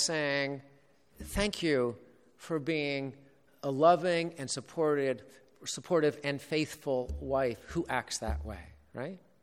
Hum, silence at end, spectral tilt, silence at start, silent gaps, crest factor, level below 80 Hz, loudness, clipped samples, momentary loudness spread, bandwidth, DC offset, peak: none; 0.25 s; -4.5 dB/octave; 0 s; none; 22 dB; -50 dBFS; -32 LUFS; under 0.1%; 15 LU; 16 kHz; under 0.1%; -10 dBFS